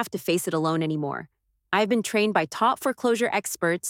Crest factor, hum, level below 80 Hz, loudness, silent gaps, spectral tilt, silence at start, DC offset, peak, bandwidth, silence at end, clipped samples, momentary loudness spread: 18 dB; none; -70 dBFS; -25 LUFS; none; -4.5 dB/octave; 0 s; under 0.1%; -8 dBFS; 18 kHz; 0 s; under 0.1%; 5 LU